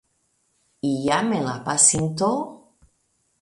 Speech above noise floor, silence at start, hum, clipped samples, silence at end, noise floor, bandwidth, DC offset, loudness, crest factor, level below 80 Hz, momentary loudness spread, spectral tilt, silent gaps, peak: 48 dB; 0.85 s; none; under 0.1%; 0.85 s; -69 dBFS; 11.5 kHz; under 0.1%; -21 LUFS; 22 dB; -58 dBFS; 13 LU; -3.5 dB/octave; none; -2 dBFS